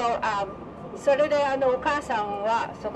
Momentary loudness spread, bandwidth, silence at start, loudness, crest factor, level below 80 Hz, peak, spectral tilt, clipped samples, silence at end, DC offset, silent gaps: 10 LU; 10.5 kHz; 0 s; -25 LUFS; 14 dB; -54 dBFS; -10 dBFS; -4.5 dB/octave; under 0.1%; 0 s; under 0.1%; none